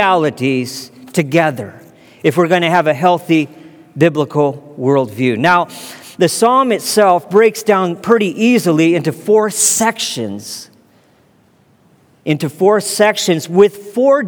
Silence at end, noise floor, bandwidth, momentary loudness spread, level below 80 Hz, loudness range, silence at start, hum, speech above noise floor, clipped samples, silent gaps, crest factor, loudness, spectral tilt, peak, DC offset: 0 s; -52 dBFS; over 20 kHz; 12 LU; -64 dBFS; 5 LU; 0 s; none; 39 dB; under 0.1%; none; 14 dB; -13 LUFS; -4.5 dB/octave; 0 dBFS; under 0.1%